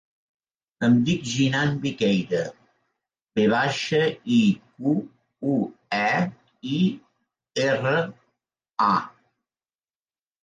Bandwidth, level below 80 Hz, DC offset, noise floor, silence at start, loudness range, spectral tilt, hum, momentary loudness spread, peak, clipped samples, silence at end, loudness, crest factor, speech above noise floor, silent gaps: 9.4 kHz; -64 dBFS; under 0.1%; under -90 dBFS; 0.8 s; 3 LU; -6 dB/octave; none; 10 LU; -8 dBFS; under 0.1%; 1.35 s; -24 LUFS; 16 dB; over 68 dB; none